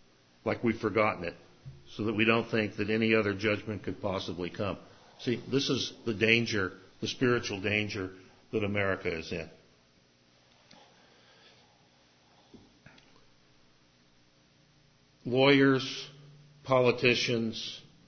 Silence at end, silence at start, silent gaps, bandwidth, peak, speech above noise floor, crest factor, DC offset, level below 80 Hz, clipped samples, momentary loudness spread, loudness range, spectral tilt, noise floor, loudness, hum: 0.25 s; 0.45 s; none; 6.6 kHz; -8 dBFS; 35 dB; 24 dB; under 0.1%; -60 dBFS; under 0.1%; 15 LU; 9 LU; -5 dB/octave; -65 dBFS; -29 LUFS; 60 Hz at -65 dBFS